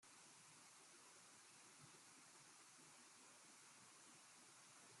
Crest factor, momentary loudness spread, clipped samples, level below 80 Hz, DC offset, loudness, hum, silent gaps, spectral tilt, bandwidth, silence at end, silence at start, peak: 12 dB; 0 LU; under 0.1%; under -90 dBFS; under 0.1%; -64 LUFS; none; none; -1 dB/octave; 13 kHz; 0 s; 0 s; -54 dBFS